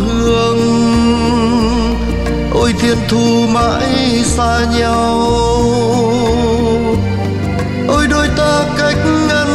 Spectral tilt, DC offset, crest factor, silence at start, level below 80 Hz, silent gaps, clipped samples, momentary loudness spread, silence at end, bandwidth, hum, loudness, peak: -5.5 dB/octave; under 0.1%; 12 dB; 0 s; -24 dBFS; none; under 0.1%; 4 LU; 0 s; 13 kHz; none; -13 LUFS; 0 dBFS